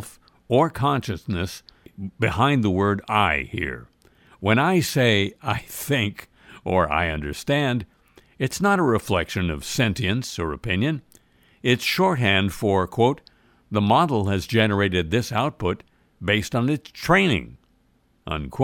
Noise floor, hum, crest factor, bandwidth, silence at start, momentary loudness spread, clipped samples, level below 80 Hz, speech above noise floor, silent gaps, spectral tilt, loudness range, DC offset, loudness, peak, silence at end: -63 dBFS; none; 18 dB; 17.5 kHz; 0 s; 11 LU; under 0.1%; -44 dBFS; 41 dB; none; -5.5 dB/octave; 3 LU; under 0.1%; -22 LUFS; -4 dBFS; 0 s